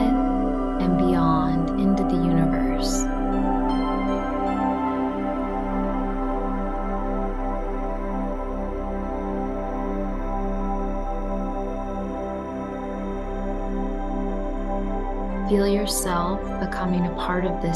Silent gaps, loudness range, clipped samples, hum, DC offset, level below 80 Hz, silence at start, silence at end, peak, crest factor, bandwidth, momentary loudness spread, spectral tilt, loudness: none; 7 LU; under 0.1%; none; under 0.1%; -30 dBFS; 0 s; 0 s; -8 dBFS; 16 dB; 12.5 kHz; 8 LU; -6 dB/octave; -25 LUFS